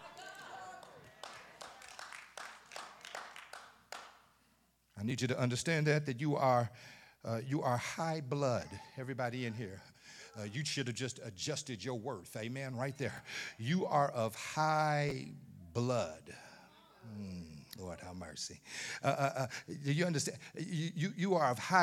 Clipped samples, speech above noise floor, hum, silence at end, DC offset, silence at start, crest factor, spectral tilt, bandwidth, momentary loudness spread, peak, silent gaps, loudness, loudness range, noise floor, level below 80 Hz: under 0.1%; 36 dB; none; 0 s; under 0.1%; 0 s; 24 dB; -5 dB/octave; 15.5 kHz; 19 LU; -14 dBFS; none; -37 LUFS; 14 LU; -73 dBFS; -74 dBFS